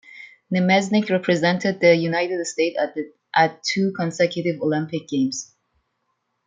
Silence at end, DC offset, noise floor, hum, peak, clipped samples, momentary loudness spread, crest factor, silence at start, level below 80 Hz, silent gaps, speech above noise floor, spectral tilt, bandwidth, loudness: 1 s; under 0.1%; -73 dBFS; none; -2 dBFS; under 0.1%; 9 LU; 20 dB; 0.1 s; -68 dBFS; none; 53 dB; -5 dB/octave; 9.4 kHz; -21 LUFS